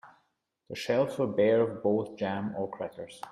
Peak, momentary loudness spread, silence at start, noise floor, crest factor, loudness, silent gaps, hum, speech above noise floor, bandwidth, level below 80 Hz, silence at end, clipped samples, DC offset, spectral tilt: -14 dBFS; 14 LU; 0.05 s; -77 dBFS; 18 dB; -30 LUFS; none; none; 47 dB; 14 kHz; -72 dBFS; 0 s; under 0.1%; under 0.1%; -6.5 dB/octave